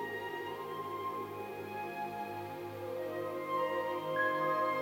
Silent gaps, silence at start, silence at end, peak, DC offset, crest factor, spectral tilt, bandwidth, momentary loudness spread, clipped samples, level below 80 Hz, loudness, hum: none; 0 s; 0 s; -20 dBFS; under 0.1%; 16 dB; -5.5 dB/octave; 16 kHz; 10 LU; under 0.1%; -78 dBFS; -37 LUFS; none